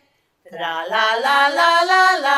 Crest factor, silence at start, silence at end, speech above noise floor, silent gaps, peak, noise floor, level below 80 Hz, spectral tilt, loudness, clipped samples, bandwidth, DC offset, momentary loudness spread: 16 dB; 0.5 s; 0 s; 37 dB; none; 0 dBFS; -53 dBFS; -82 dBFS; -1 dB/octave; -15 LUFS; under 0.1%; 15.5 kHz; under 0.1%; 12 LU